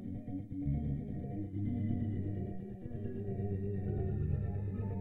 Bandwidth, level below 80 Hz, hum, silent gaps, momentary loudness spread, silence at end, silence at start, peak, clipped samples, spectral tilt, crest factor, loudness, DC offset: 3.2 kHz; -48 dBFS; none; none; 7 LU; 0 s; 0 s; -24 dBFS; under 0.1%; -12 dB/octave; 14 dB; -39 LUFS; under 0.1%